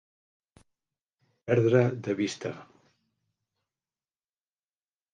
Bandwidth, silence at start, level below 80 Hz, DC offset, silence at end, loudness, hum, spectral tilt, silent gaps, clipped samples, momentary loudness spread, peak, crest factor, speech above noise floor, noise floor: 9.4 kHz; 1.45 s; -72 dBFS; under 0.1%; 2.5 s; -27 LUFS; none; -7 dB/octave; none; under 0.1%; 19 LU; -10 dBFS; 22 dB; over 64 dB; under -90 dBFS